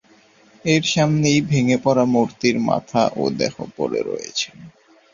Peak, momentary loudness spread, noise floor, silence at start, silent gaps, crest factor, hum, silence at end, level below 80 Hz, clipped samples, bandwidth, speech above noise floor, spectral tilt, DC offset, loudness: -2 dBFS; 8 LU; -53 dBFS; 0.65 s; none; 18 dB; none; 0.45 s; -56 dBFS; under 0.1%; 7.4 kHz; 34 dB; -5 dB/octave; under 0.1%; -20 LUFS